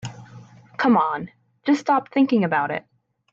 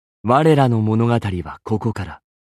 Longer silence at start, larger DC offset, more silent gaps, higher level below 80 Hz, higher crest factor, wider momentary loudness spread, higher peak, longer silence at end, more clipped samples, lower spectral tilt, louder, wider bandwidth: second, 0.05 s vs 0.25 s; neither; neither; second, -66 dBFS vs -48 dBFS; about the same, 16 dB vs 16 dB; about the same, 16 LU vs 14 LU; second, -8 dBFS vs -2 dBFS; first, 0.5 s vs 0.35 s; neither; second, -6.5 dB/octave vs -8 dB/octave; second, -21 LUFS vs -18 LUFS; second, 7.6 kHz vs 11.5 kHz